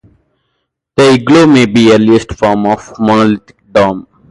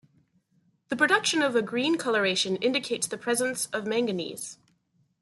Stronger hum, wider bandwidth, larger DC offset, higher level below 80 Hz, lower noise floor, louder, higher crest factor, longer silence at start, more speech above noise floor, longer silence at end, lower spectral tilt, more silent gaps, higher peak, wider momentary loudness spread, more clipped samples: neither; about the same, 11.5 kHz vs 12.5 kHz; neither; first, -40 dBFS vs -74 dBFS; about the same, -67 dBFS vs -70 dBFS; first, -9 LUFS vs -26 LUFS; second, 10 dB vs 18 dB; about the same, 0.95 s vs 0.9 s; first, 59 dB vs 43 dB; second, 0.3 s vs 0.7 s; first, -6 dB/octave vs -2.5 dB/octave; neither; first, 0 dBFS vs -10 dBFS; about the same, 9 LU vs 11 LU; neither